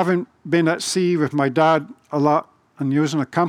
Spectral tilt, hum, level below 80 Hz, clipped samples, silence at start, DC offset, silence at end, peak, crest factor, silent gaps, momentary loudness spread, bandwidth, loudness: -5.5 dB/octave; none; -70 dBFS; under 0.1%; 0 s; under 0.1%; 0 s; -4 dBFS; 16 dB; none; 5 LU; 15 kHz; -20 LUFS